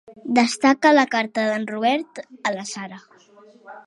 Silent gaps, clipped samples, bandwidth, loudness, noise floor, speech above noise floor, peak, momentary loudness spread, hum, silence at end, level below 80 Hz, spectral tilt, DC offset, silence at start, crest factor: none; under 0.1%; 11.5 kHz; -20 LUFS; -50 dBFS; 30 dB; -2 dBFS; 16 LU; none; 0.05 s; -70 dBFS; -3.5 dB/octave; under 0.1%; 0.1 s; 20 dB